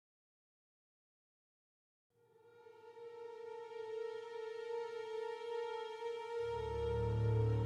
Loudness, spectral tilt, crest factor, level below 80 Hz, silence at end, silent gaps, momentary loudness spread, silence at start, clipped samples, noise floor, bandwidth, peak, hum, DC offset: -42 LUFS; -7.5 dB/octave; 16 dB; -56 dBFS; 0 s; none; 16 LU; 2.45 s; under 0.1%; -66 dBFS; 8.4 kHz; -26 dBFS; none; under 0.1%